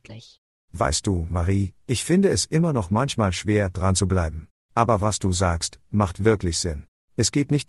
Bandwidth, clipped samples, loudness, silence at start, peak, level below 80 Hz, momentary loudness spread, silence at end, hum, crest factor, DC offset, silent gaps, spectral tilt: 12 kHz; under 0.1%; -23 LUFS; 0.1 s; -4 dBFS; -42 dBFS; 8 LU; 0.05 s; none; 18 dB; under 0.1%; 0.38-0.68 s, 4.51-4.69 s, 6.88-7.08 s; -5 dB/octave